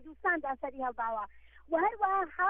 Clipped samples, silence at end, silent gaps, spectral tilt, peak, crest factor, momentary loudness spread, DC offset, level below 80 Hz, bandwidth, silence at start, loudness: under 0.1%; 0 s; none; -7.5 dB/octave; -16 dBFS; 16 dB; 8 LU; under 0.1%; -62 dBFS; 3.7 kHz; 0 s; -33 LUFS